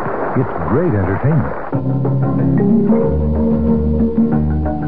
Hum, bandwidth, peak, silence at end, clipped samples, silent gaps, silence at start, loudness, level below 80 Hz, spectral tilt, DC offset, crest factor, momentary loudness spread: none; 3.5 kHz; -2 dBFS; 0 s; under 0.1%; none; 0 s; -16 LUFS; -26 dBFS; -15 dB/octave; 5%; 12 dB; 5 LU